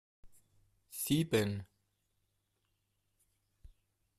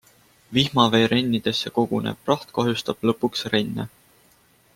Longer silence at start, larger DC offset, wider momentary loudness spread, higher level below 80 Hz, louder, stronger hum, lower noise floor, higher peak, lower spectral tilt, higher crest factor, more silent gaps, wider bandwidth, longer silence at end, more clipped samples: second, 0.25 s vs 0.5 s; neither; first, 14 LU vs 8 LU; second, -66 dBFS vs -58 dBFS; second, -34 LUFS vs -22 LUFS; neither; first, -81 dBFS vs -58 dBFS; second, -18 dBFS vs -2 dBFS; about the same, -5 dB/octave vs -5.5 dB/octave; about the same, 22 dB vs 22 dB; neither; second, 14.5 kHz vs 16.5 kHz; second, 0.5 s vs 0.9 s; neither